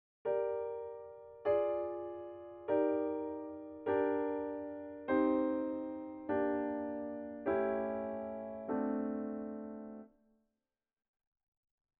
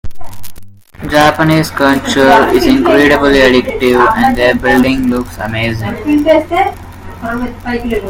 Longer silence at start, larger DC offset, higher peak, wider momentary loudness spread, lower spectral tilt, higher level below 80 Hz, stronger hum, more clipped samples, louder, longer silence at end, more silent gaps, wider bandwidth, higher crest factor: first, 0.25 s vs 0.05 s; neither; second, -20 dBFS vs 0 dBFS; about the same, 14 LU vs 12 LU; about the same, -6 dB/octave vs -5.5 dB/octave; second, -72 dBFS vs -30 dBFS; neither; second, under 0.1% vs 0.4%; second, -37 LUFS vs -10 LUFS; first, 1.9 s vs 0 s; neither; second, 4 kHz vs 17 kHz; first, 18 dB vs 10 dB